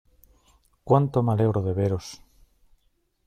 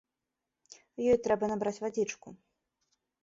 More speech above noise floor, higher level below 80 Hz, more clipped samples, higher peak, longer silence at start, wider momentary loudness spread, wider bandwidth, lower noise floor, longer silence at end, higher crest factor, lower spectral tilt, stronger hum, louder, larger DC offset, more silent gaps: second, 46 dB vs 57 dB; first, -56 dBFS vs -66 dBFS; neither; first, -6 dBFS vs -14 dBFS; second, 0.85 s vs 1 s; second, 9 LU vs 14 LU; first, 12 kHz vs 7.8 kHz; second, -69 dBFS vs -88 dBFS; first, 1.1 s vs 0.9 s; about the same, 20 dB vs 20 dB; first, -8.5 dB/octave vs -5.5 dB/octave; neither; first, -24 LUFS vs -31 LUFS; neither; neither